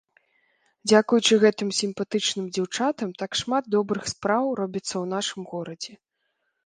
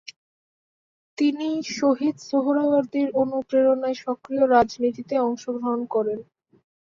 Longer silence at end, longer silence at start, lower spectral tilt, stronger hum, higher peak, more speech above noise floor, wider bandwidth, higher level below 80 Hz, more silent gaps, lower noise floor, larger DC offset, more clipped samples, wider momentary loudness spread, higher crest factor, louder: about the same, 0.7 s vs 0.7 s; second, 0.85 s vs 1.2 s; second, -3.5 dB/octave vs -5 dB/octave; neither; about the same, -6 dBFS vs -6 dBFS; second, 52 dB vs over 68 dB; first, 10 kHz vs 7.4 kHz; about the same, -64 dBFS vs -64 dBFS; neither; second, -76 dBFS vs under -90 dBFS; neither; neither; first, 14 LU vs 9 LU; about the same, 20 dB vs 18 dB; about the same, -24 LUFS vs -23 LUFS